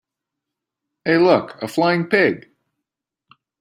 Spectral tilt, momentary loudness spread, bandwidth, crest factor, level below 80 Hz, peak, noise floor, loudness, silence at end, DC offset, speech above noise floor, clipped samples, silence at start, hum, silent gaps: -6.5 dB/octave; 11 LU; 15.5 kHz; 18 dB; -64 dBFS; -2 dBFS; -83 dBFS; -18 LUFS; 1.2 s; under 0.1%; 66 dB; under 0.1%; 1.05 s; none; none